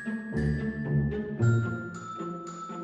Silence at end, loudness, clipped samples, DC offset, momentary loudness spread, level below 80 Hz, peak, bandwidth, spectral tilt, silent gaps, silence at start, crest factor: 0 s; -30 LUFS; under 0.1%; under 0.1%; 12 LU; -44 dBFS; -14 dBFS; 8.4 kHz; -8 dB/octave; none; 0 s; 16 dB